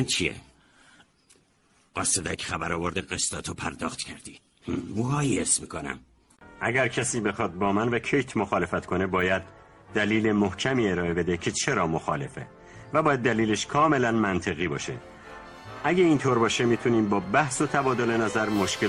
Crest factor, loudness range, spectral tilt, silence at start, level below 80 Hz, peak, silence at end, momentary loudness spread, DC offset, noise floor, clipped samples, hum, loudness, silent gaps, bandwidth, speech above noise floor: 20 dB; 5 LU; -4 dB/octave; 0 s; -54 dBFS; -6 dBFS; 0 s; 13 LU; under 0.1%; -64 dBFS; under 0.1%; none; -26 LUFS; none; 16 kHz; 39 dB